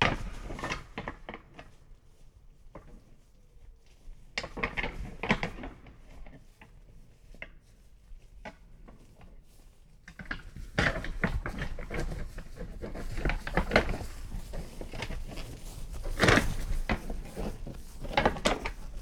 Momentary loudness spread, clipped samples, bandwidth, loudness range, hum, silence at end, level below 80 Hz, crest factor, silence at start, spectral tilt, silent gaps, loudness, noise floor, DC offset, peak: 24 LU; under 0.1%; 16.5 kHz; 21 LU; none; 0 s; -40 dBFS; 28 dB; 0 s; -4.5 dB/octave; none; -33 LUFS; -56 dBFS; under 0.1%; -6 dBFS